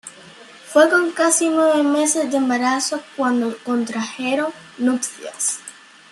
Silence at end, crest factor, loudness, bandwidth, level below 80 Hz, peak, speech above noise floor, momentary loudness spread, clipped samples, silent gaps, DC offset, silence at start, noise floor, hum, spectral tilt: 0.4 s; 18 dB; -19 LUFS; 13 kHz; -72 dBFS; -2 dBFS; 24 dB; 9 LU; under 0.1%; none; under 0.1%; 0.05 s; -43 dBFS; none; -2 dB/octave